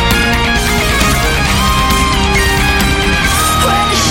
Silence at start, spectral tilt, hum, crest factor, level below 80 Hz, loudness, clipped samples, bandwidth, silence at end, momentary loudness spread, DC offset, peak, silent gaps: 0 s; -3.5 dB/octave; none; 10 dB; -18 dBFS; -11 LUFS; under 0.1%; 17 kHz; 0 s; 1 LU; under 0.1%; 0 dBFS; none